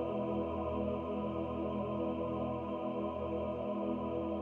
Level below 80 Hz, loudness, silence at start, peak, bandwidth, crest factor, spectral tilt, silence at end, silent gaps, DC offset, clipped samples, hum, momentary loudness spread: -54 dBFS; -37 LUFS; 0 s; -24 dBFS; 4.4 kHz; 12 dB; -9.5 dB/octave; 0 s; none; under 0.1%; under 0.1%; none; 2 LU